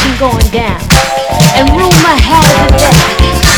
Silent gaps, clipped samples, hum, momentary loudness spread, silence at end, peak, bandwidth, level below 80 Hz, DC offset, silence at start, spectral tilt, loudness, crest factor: none; 3%; none; 5 LU; 0 s; 0 dBFS; over 20 kHz; -14 dBFS; under 0.1%; 0 s; -4 dB/octave; -7 LUFS; 6 dB